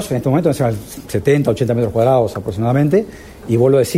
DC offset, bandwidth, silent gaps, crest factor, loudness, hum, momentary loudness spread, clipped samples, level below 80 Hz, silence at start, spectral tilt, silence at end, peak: under 0.1%; 16 kHz; none; 14 dB; -16 LUFS; none; 8 LU; under 0.1%; -42 dBFS; 0 s; -7 dB/octave; 0 s; -2 dBFS